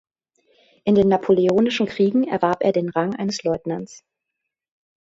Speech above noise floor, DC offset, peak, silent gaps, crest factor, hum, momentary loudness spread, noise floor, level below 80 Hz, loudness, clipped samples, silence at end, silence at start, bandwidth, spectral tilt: 62 dB; under 0.1%; -4 dBFS; none; 18 dB; none; 10 LU; -82 dBFS; -56 dBFS; -20 LUFS; under 0.1%; 1.05 s; 0.85 s; 7.8 kHz; -6.5 dB/octave